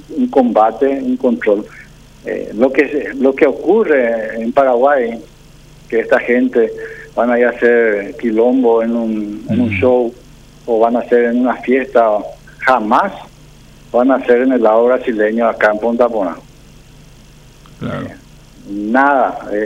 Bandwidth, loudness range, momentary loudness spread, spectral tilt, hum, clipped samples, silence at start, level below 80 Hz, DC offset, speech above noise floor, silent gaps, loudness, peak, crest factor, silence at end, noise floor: 10 kHz; 4 LU; 12 LU; -7 dB/octave; none; under 0.1%; 0.1 s; -46 dBFS; under 0.1%; 27 dB; none; -14 LUFS; 0 dBFS; 14 dB; 0 s; -41 dBFS